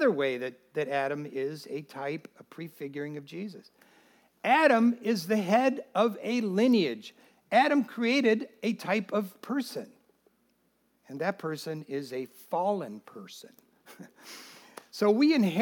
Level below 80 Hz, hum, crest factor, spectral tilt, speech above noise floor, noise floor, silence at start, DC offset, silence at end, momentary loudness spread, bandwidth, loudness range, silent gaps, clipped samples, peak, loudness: -88 dBFS; none; 20 dB; -5.5 dB/octave; 43 dB; -71 dBFS; 0 s; under 0.1%; 0 s; 22 LU; 18.5 kHz; 11 LU; none; under 0.1%; -8 dBFS; -28 LUFS